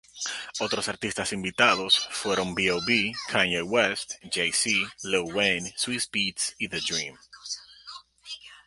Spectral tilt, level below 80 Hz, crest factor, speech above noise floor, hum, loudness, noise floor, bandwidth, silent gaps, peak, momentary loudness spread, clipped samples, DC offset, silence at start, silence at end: -2 dB/octave; -60 dBFS; 22 dB; 20 dB; none; -25 LUFS; -47 dBFS; 11.5 kHz; none; -6 dBFS; 15 LU; under 0.1%; under 0.1%; 0.15 s; 0.1 s